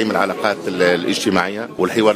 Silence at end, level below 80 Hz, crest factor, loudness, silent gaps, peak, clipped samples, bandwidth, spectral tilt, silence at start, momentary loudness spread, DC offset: 0 s; -58 dBFS; 18 dB; -18 LUFS; none; 0 dBFS; under 0.1%; 15.5 kHz; -4.5 dB/octave; 0 s; 5 LU; under 0.1%